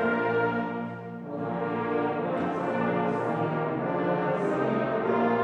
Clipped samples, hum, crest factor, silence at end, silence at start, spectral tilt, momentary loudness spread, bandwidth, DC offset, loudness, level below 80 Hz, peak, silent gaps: under 0.1%; none; 14 dB; 0 s; 0 s; -8.5 dB/octave; 7 LU; 8.8 kHz; under 0.1%; -28 LUFS; -64 dBFS; -14 dBFS; none